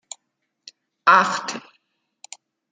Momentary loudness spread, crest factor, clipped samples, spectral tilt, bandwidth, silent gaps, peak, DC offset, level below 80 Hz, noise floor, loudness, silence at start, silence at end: 26 LU; 22 dB; under 0.1%; -2 dB/octave; 9.6 kHz; none; -2 dBFS; under 0.1%; -78 dBFS; -77 dBFS; -18 LUFS; 1.05 s; 1.15 s